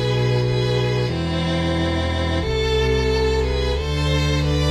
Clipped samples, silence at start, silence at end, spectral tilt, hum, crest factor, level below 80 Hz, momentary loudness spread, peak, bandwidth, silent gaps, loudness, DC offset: under 0.1%; 0 s; 0 s; -6 dB/octave; none; 12 dB; -28 dBFS; 3 LU; -8 dBFS; 13 kHz; none; -20 LUFS; under 0.1%